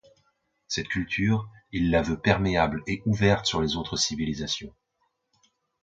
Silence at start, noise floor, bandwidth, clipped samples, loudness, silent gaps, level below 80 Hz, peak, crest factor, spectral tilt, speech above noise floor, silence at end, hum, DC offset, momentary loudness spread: 0.7 s; -75 dBFS; 9.2 kHz; under 0.1%; -26 LUFS; none; -44 dBFS; -6 dBFS; 22 dB; -4.5 dB/octave; 49 dB; 1.15 s; none; under 0.1%; 9 LU